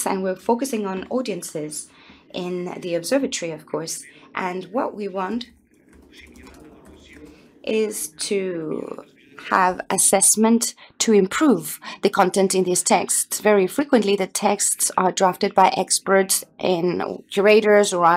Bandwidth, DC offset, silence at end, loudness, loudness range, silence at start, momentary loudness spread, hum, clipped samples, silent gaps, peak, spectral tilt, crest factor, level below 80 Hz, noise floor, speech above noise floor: 16 kHz; under 0.1%; 0 s; -20 LUFS; 12 LU; 0 s; 14 LU; none; under 0.1%; none; -2 dBFS; -3 dB/octave; 18 dB; -62 dBFS; -52 dBFS; 32 dB